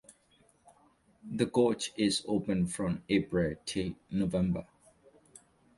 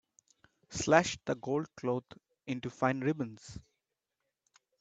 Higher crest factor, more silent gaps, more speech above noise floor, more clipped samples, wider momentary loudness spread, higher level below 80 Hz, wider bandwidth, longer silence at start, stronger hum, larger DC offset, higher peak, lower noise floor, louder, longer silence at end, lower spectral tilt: second, 20 dB vs 26 dB; neither; second, 36 dB vs 54 dB; neither; second, 7 LU vs 22 LU; first, -56 dBFS vs -66 dBFS; first, 11.5 kHz vs 9.2 kHz; second, 0.1 s vs 0.7 s; neither; neither; second, -14 dBFS vs -8 dBFS; second, -67 dBFS vs -87 dBFS; about the same, -32 LUFS vs -33 LUFS; about the same, 1.15 s vs 1.2 s; about the same, -5.5 dB/octave vs -5 dB/octave